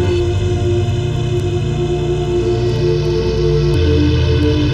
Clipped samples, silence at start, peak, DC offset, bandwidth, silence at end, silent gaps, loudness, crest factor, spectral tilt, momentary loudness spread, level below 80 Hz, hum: under 0.1%; 0 s; -2 dBFS; under 0.1%; 9.2 kHz; 0 s; none; -16 LUFS; 12 dB; -7.5 dB/octave; 4 LU; -24 dBFS; none